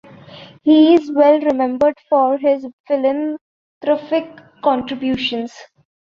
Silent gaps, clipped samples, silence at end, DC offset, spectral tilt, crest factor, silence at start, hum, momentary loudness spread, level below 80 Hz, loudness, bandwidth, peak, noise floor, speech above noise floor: 2.73-2.84 s, 3.41-3.81 s; under 0.1%; 0.4 s; under 0.1%; -6 dB/octave; 16 dB; 0.3 s; none; 13 LU; -58 dBFS; -16 LUFS; 7 kHz; -2 dBFS; -40 dBFS; 24 dB